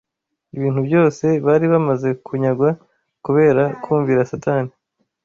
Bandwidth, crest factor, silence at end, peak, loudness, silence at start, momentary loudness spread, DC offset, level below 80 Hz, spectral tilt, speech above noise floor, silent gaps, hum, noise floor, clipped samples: 7.4 kHz; 14 dB; 0.55 s; -4 dBFS; -17 LUFS; 0.55 s; 9 LU; under 0.1%; -56 dBFS; -9 dB/octave; 55 dB; none; none; -72 dBFS; under 0.1%